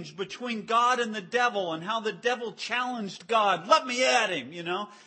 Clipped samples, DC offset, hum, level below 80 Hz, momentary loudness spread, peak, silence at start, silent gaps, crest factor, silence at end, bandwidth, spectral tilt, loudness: under 0.1%; under 0.1%; none; -82 dBFS; 10 LU; -8 dBFS; 0 s; none; 20 dB; 0.1 s; 8.8 kHz; -2.5 dB/octave; -27 LUFS